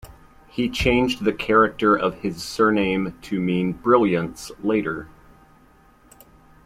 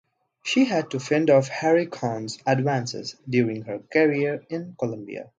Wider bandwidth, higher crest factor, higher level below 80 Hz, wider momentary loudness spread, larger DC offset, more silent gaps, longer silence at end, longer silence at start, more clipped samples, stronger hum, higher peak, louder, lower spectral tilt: first, 15.5 kHz vs 9.4 kHz; about the same, 20 dB vs 18 dB; first, -44 dBFS vs -68 dBFS; about the same, 11 LU vs 12 LU; neither; neither; first, 1.6 s vs 0.15 s; second, 0.05 s vs 0.45 s; neither; neither; about the same, -4 dBFS vs -6 dBFS; first, -21 LUFS vs -24 LUFS; about the same, -6 dB/octave vs -6 dB/octave